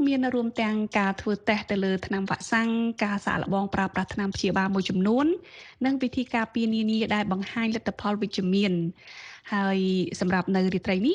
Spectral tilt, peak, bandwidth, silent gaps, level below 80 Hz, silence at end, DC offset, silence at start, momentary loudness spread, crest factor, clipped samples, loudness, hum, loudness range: -6 dB/octave; -8 dBFS; 10 kHz; none; -56 dBFS; 0 s; under 0.1%; 0 s; 5 LU; 18 dB; under 0.1%; -26 LUFS; none; 1 LU